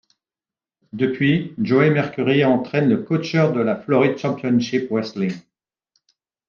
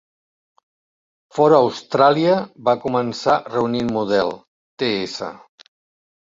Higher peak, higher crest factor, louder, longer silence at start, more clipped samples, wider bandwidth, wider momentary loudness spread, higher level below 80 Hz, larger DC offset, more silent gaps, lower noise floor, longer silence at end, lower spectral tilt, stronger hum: about the same, -2 dBFS vs -2 dBFS; about the same, 18 dB vs 18 dB; about the same, -19 LUFS vs -19 LUFS; second, 0.95 s vs 1.35 s; neither; second, 7 kHz vs 7.8 kHz; second, 8 LU vs 13 LU; second, -64 dBFS vs -58 dBFS; neither; second, none vs 4.48-4.77 s; about the same, under -90 dBFS vs under -90 dBFS; first, 1.1 s vs 0.85 s; first, -7.5 dB/octave vs -6 dB/octave; neither